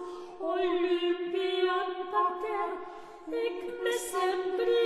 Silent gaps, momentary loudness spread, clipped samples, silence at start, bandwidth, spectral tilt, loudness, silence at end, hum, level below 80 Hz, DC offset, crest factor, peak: none; 9 LU; under 0.1%; 0 s; 13 kHz; -2 dB/octave; -31 LUFS; 0 s; none; -68 dBFS; under 0.1%; 14 dB; -16 dBFS